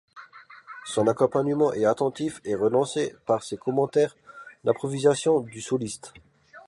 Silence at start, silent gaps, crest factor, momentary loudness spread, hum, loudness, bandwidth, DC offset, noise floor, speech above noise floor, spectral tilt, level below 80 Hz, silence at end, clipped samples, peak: 0.15 s; none; 18 dB; 11 LU; none; -25 LUFS; 11.5 kHz; under 0.1%; -48 dBFS; 24 dB; -5.5 dB/octave; -64 dBFS; 0.05 s; under 0.1%; -8 dBFS